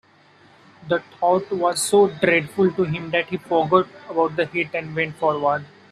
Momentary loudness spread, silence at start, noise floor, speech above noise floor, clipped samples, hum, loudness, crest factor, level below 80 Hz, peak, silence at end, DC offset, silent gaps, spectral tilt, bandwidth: 8 LU; 0.8 s; -53 dBFS; 32 dB; under 0.1%; none; -21 LUFS; 20 dB; -62 dBFS; -2 dBFS; 0.25 s; under 0.1%; none; -4.5 dB/octave; 14 kHz